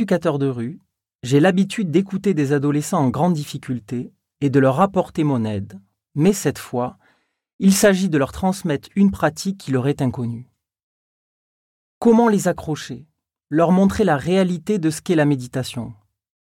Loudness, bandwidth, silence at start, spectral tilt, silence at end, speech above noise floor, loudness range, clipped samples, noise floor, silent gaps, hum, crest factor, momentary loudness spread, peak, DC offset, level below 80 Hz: -19 LUFS; 16.5 kHz; 0 s; -6 dB/octave; 0.45 s; 44 dB; 3 LU; under 0.1%; -62 dBFS; 1.15-1.19 s, 7.53-7.59 s, 10.83-12.01 s; none; 14 dB; 13 LU; -4 dBFS; under 0.1%; -50 dBFS